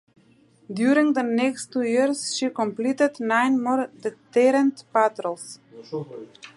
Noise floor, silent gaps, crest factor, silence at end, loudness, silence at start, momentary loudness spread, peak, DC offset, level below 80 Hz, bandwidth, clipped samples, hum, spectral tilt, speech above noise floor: -57 dBFS; none; 18 dB; 0.1 s; -23 LUFS; 0.7 s; 16 LU; -6 dBFS; under 0.1%; -78 dBFS; 11.5 kHz; under 0.1%; none; -4 dB/octave; 34 dB